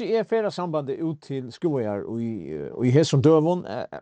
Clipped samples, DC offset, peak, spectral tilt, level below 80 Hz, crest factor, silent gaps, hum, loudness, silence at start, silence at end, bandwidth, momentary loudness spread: under 0.1%; under 0.1%; -6 dBFS; -7 dB/octave; -64 dBFS; 18 dB; none; none; -24 LUFS; 0 s; 0 s; 9.2 kHz; 14 LU